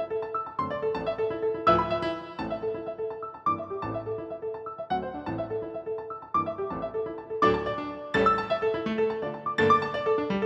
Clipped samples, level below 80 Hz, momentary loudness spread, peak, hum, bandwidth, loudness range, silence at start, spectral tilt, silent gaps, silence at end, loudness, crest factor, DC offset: under 0.1%; -54 dBFS; 11 LU; -8 dBFS; none; 7.8 kHz; 7 LU; 0 s; -7 dB/octave; none; 0 s; -29 LUFS; 20 dB; under 0.1%